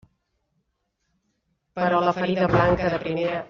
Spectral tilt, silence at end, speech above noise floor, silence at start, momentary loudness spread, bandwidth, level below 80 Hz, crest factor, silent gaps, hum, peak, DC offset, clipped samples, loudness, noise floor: -5 dB/octave; 0.05 s; 53 dB; 1.75 s; 7 LU; 7 kHz; -48 dBFS; 20 dB; none; none; -4 dBFS; under 0.1%; under 0.1%; -22 LUFS; -75 dBFS